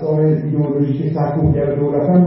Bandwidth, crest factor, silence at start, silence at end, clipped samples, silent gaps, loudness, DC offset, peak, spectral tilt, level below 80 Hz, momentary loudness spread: 5.6 kHz; 12 dB; 0 s; 0 s; under 0.1%; none; -17 LUFS; under 0.1%; -2 dBFS; -15 dB/octave; -38 dBFS; 3 LU